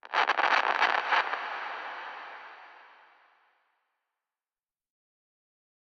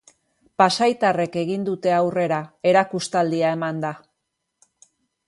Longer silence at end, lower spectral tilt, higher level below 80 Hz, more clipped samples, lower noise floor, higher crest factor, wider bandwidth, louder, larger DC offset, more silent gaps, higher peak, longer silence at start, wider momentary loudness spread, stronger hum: first, 3 s vs 1.3 s; second, -0.5 dB/octave vs -5 dB/octave; second, -88 dBFS vs -68 dBFS; neither; first, under -90 dBFS vs -78 dBFS; about the same, 22 dB vs 20 dB; second, 8.4 kHz vs 11.5 kHz; second, -27 LUFS vs -21 LUFS; neither; neither; second, -12 dBFS vs -2 dBFS; second, 0.1 s vs 0.6 s; first, 21 LU vs 9 LU; neither